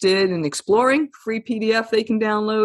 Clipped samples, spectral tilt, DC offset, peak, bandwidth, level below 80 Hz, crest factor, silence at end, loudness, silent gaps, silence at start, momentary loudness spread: under 0.1%; -4.5 dB/octave; under 0.1%; -6 dBFS; 12.5 kHz; -62 dBFS; 14 dB; 0 s; -20 LUFS; none; 0 s; 8 LU